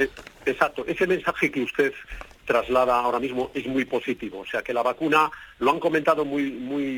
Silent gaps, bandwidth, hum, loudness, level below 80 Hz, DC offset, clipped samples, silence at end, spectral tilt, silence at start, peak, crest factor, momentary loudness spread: none; 19 kHz; none; -24 LUFS; -52 dBFS; under 0.1%; under 0.1%; 0 s; -5 dB/octave; 0 s; -4 dBFS; 20 dB; 9 LU